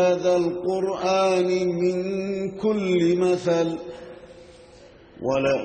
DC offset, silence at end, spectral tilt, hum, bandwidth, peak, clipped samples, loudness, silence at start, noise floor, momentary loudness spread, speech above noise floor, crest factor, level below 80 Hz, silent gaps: under 0.1%; 0 s; -6 dB/octave; none; 8.8 kHz; -10 dBFS; under 0.1%; -23 LUFS; 0 s; -48 dBFS; 10 LU; 26 dB; 12 dB; -58 dBFS; none